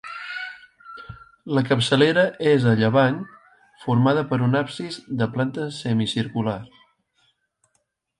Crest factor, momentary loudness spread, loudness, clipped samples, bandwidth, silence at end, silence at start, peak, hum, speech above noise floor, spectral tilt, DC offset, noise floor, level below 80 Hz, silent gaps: 18 dB; 22 LU; -22 LUFS; under 0.1%; 11.5 kHz; 1.55 s; 0.05 s; -4 dBFS; none; 51 dB; -6.5 dB/octave; under 0.1%; -72 dBFS; -60 dBFS; none